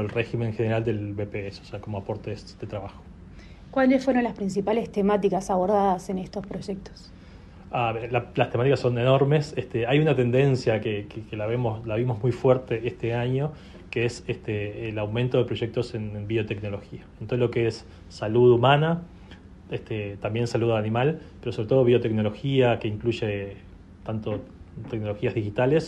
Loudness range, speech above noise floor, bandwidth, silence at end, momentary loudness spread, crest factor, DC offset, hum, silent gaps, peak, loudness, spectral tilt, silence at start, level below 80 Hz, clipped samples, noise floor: 5 LU; 21 dB; 10.5 kHz; 0 s; 15 LU; 20 dB; under 0.1%; none; none; -6 dBFS; -25 LUFS; -7.5 dB/octave; 0 s; -50 dBFS; under 0.1%; -46 dBFS